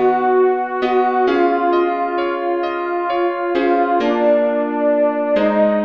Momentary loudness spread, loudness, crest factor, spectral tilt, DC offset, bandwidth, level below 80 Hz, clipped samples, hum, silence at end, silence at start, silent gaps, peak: 5 LU; -17 LUFS; 12 dB; -7.5 dB/octave; 0.2%; 6.2 kHz; -56 dBFS; under 0.1%; none; 0 s; 0 s; none; -4 dBFS